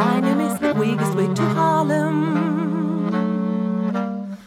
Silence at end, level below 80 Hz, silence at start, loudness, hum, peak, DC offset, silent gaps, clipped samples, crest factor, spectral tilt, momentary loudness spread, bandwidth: 0 s; -64 dBFS; 0 s; -20 LUFS; none; -6 dBFS; under 0.1%; none; under 0.1%; 14 dB; -7 dB/octave; 4 LU; 15.5 kHz